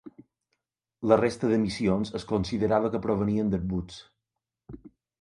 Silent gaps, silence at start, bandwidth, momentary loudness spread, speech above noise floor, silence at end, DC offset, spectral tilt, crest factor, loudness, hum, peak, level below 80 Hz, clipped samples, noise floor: none; 0.05 s; 11 kHz; 16 LU; 60 dB; 0.35 s; under 0.1%; -7 dB/octave; 24 dB; -27 LUFS; none; -6 dBFS; -50 dBFS; under 0.1%; -86 dBFS